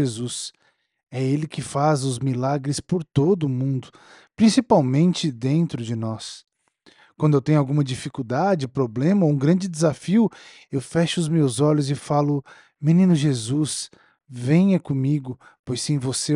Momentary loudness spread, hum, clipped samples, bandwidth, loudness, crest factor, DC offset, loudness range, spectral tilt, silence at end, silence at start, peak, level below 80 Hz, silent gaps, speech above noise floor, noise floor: 12 LU; none; under 0.1%; 11.5 kHz; -22 LUFS; 18 dB; under 0.1%; 3 LU; -6.5 dB/octave; 0 s; 0 s; -4 dBFS; -60 dBFS; 15.59-15.64 s; 36 dB; -58 dBFS